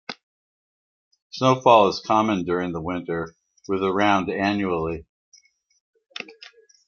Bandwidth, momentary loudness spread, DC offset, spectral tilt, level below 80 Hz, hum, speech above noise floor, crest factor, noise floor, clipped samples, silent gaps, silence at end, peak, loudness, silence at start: 7.2 kHz; 21 LU; under 0.1%; -6 dB/octave; -58 dBFS; none; 29 dB; 22 dB; -49 dBFS; under 0.1%; 0.23-1.11 s, 1.22-1.30 s, 5.09-5.32 s, 5.80-5.93 s; 0.55 s; -2 dBFS; -21 LUFS; 0.1 s